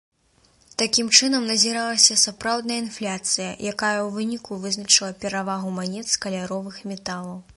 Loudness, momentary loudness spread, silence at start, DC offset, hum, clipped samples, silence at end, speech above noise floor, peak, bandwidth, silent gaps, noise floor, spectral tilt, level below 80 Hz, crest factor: -21 LUFS; 15 LU; 0.8 s; under 0.1%; none; under 0.1%; 0.05 s; 37 dB; 0 dBFS; 11.5 kHz; none; -61 dBFS; -1.5 dB/octave; -62 dBFS; 24 dB